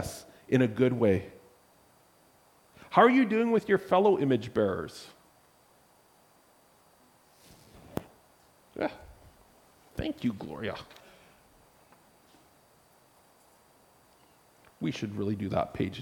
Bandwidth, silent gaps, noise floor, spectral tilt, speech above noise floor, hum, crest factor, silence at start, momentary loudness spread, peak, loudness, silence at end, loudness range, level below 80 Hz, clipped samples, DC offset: 18.5 kHz; none; -63 dBFS; -7 dB/octave; 36 dB; none; 24 dB; 0 s; 20 LU; -8 dBFS; -28 LUFS; 0 s; 20 LU; -60 dBFS; under 0.1%; under 0.1%